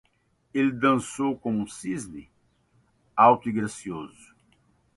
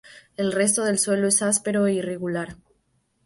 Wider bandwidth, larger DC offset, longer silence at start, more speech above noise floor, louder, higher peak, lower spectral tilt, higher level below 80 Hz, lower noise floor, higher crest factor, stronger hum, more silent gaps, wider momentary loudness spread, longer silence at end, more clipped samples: about the same, 11.5 kHz vs 12 kHz; neither; first, 0.55 s vs 0.05 s; about the same, 43 dB vs 46 dB; second, -25 LUFS vs -22 LUFS; about the same, -6 dBFS vs -6 dBFS; first, -5.5 dB/octave vs -3.5 dB/octave; about the same, -62 dBFS vs -62 dBFS; about the same, -68 dBFS vs -69 dBFS; about the same, 22 dB vs 18 dB; neither; neither; first, 19 LU vs 10 LU; first, 0.9 s vs 0.7 s; neither